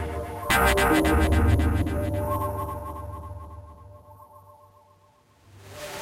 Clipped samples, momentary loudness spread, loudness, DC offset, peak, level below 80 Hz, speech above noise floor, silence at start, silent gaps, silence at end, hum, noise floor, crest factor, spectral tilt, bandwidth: under 0.1%; 20 LU; -24 LUFS; under 0.1%; -8 dBFS; -32 dBFS; 39 dB; 0 s; none; 0 s; none; -59 dBFS; 18 dB; -5.5 dB/octave; 16 kHz